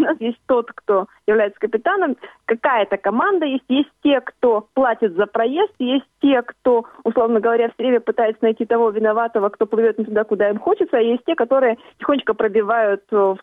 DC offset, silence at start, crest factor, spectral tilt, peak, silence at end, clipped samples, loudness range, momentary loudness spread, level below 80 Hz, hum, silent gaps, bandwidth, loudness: under 0.1%; 0 s; 14 dB; -7.5 dB/octave; -4 dBFS; 0.05 s; under 0.1%; 1 LU; 3 LU; -62 dBFS; none; none; 3.8 kHz; -19 LUFS